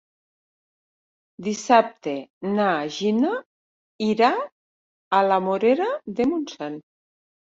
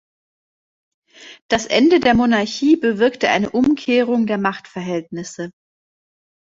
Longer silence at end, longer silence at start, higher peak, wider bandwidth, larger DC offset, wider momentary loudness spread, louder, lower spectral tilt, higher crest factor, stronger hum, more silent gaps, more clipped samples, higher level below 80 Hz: second, 0.75 s vs 1 s; first, 1.4 s vs 1.2 s; about the same, -2 dBFS vs -2 dBFS; about the same, 7.8 kHz vs 7.8 kHz; neither; about the same, 13 LU vs 15 LU; second, -23 LUFS vs -17 LUFS; about the same, -5 dB/octave vs -5 dB/octave; about the same, 22 dB vs 18 dB; neither; first, 2.30-2.41 s, 3.46-3.99 s, 4.52-5.11 s vs 1.42-1.49 s; neither; second, -66 dBFS vs -52 dBFS